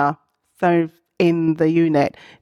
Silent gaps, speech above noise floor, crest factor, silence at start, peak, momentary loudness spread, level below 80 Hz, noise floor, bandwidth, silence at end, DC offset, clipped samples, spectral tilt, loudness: none; 19 dB; 14 dB; 0 s; -4 dBFS; 8 LU; -62 dBFS; -36 dBFS; 6.8 kHz; 0.35 s; under 0.1%; under 0.1%; -8 dB/octave; -19 LUFS